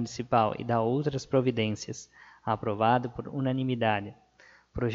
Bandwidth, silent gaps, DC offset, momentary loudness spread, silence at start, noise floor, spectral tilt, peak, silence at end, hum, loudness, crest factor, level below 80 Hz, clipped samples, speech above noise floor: 7.8 kHz; none; under 0.1%; 13 LU; 0 s; -59 dBFS; -6.5 dB/octave; -10 dBFS; 0 s; none; -29 LUFS; 18 dB; -56 dBFS; under 0.1%; 30 dB